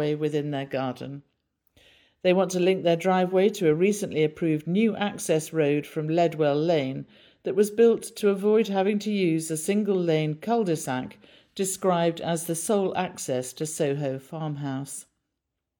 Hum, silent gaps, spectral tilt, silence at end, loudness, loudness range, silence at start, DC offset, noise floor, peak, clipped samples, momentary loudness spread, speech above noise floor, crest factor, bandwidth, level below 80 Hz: none; none; -5.5 dB/octave; 0.8 s; -25 LUFS; 4 LU; 0 s; under 0.1%; -83 dBFS; -8 dBFS; under 0.1%; 10 LU; 58 dB; 16 dB; 19 kHz; -72 dBFS